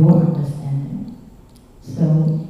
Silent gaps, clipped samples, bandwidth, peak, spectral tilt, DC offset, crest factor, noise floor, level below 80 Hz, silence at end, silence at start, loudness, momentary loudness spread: none; under 0.1%; 5.8 kHz; -2 dBFS; -11 dB/octave; under 0.1%; 16 dB; -44 dBFS; -48 dBFS; 0 s; 0 s; -19 LUFS; 17 LU